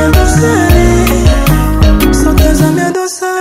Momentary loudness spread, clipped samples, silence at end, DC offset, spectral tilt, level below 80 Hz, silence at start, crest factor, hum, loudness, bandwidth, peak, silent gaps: 5 LU; 0.6%; 0 s; under 0.1%; -5.5 dB/octave; -12 dBFS; 0 s; 8 dB; none; -9 LUFS; 16.5 kHz; 0 dBFS; none